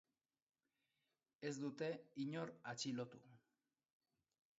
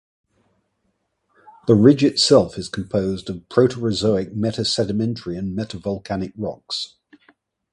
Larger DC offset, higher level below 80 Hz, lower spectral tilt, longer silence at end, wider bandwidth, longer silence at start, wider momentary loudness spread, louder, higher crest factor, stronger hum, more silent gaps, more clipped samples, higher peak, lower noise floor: neither; second, under -90 dBFS vs -50 dBFS; about the same, -4.5 dB/octave vs -5.5 dB/octave; first, 1.2 s vs 0.85 s; second, 7.6 kHz vs 11.5 kHz; second, 1.4 s vs 1.65 s; second, 6 LU vs 14 LU; second, -48 LUFS vs -20 LUFS; about the same, 18 dB vs 20 dB; neither; neither; neither; second, -32 dBFS vs 0 dBFS; first, under -90 dBFS vs -71 dBFS